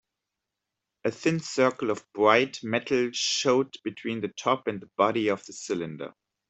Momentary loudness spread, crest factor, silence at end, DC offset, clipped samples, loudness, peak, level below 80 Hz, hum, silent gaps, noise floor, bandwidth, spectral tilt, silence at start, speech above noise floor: 11 LU; 24 dB; 0.4 s; under 0.1%; under 0.1%; -27 LUFS; -4 dBFS; -70 dBFS; none; none; -86 dBFS; 8.4 kHz; -4 dB/octave; 1.05 s; 59 dB